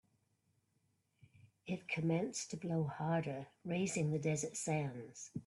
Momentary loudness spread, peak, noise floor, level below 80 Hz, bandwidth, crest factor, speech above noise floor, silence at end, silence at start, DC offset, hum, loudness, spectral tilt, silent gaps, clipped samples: 9 LU; -24 dBFS; -80 dBFS; -76 dBFS; 12 kHz; 16 dB; 41 dB; 0.05 s; 1.45 s; under 0.1%; none; -39 LUFS; -5.5 dB/octave; none; under 0.1%